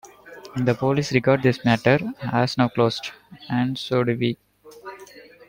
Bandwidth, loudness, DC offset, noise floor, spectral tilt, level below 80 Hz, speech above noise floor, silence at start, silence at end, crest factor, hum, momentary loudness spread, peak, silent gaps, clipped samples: 16.5 kHz; -22 LUFS; under 0.1%; -46 dBFS; -6.5 dB/octave; -56 dBFS; 24 dB; 0.05 s; 0.25 s; 20 dB; none; 21 LU; -4 dBFS; none; under 0.1%